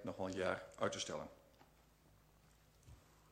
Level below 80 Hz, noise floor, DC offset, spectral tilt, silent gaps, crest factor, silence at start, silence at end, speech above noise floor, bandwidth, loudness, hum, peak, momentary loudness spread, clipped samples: -72 dBFS; -69 dBFS; under 0.1%; -4 dB/octave; none; 22 dB; 0 s; 0.15 s; 26 dB; 16 kHz; -43 LUFS; none; -24 dBFS; 24 LU; under 0.1%